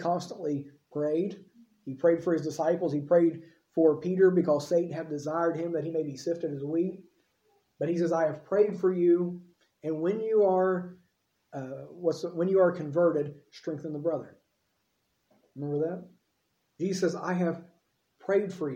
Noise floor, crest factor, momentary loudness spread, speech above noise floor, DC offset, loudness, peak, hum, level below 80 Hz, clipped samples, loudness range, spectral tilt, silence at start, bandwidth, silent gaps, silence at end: -76 dBFS; 18 dB; 15 LU; 48 dB; under 0.1%; -28 LUFS; -12 dBFS; none; -78 dBFS; under 0.1%; 7 LU; -7.5 dB/octave; 0 s; 9 kHz; none; 0 s